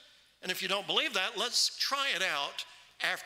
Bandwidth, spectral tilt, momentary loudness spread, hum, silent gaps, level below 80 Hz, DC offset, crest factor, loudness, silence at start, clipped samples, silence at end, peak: 16 kHz; 0 dB/octave; 11 LU; none; none; -82 dBFS; under 0.1%; 20 dB; -30 LUFS; 0.4 s; under 0.1%; 0 s; -14 dBFS